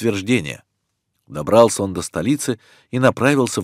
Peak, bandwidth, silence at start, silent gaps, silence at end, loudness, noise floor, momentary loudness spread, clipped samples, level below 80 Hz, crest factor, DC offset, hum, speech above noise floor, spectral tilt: 0 dBFS; 16 kHz; 0 s; none; 0 s; -18 LUFS; -73 dBFS; 16 LU; under 0.1%; -54 dBFS; 18 dB; under 0.1%; none; 55 dB; -5 dB/octave